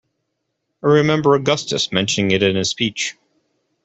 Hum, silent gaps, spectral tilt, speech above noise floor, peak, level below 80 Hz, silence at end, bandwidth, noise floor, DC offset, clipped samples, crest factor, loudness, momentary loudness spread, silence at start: none; none; -4.5 dB/octave; 57 dB; -2 dBFS; -56 dBFS; 0.75 s; 8.4 kHz; -74 dBFS; under 0.1%; under 0.1%; 16 dB; -17 LUFS; 7 LU; 0.85 s